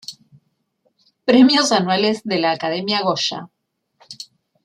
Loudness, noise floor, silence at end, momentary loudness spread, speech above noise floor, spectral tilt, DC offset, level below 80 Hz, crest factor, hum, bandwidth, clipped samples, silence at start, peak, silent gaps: -17 LUFS; -67 dBFS; 0.4 s; 23 LU; 50 dB; -4 dB/octave; under 0.1%; -66 dBFS; 18 dB; none; 11.5 kHz; under 0.1%; 0.1 s; -2 dBFS; none